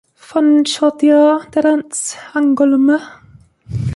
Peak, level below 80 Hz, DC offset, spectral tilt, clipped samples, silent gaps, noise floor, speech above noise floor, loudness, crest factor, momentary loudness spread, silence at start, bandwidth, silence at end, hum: -2 dBFS; -44 dBFS; under 0.1%; -5 dB/octave; under 0.1%; none; -43 dBFS; 30 dB; -14 LUFS; 12 dB; 10 LU; 0.3 s; 11.5 kHz; 0 s; none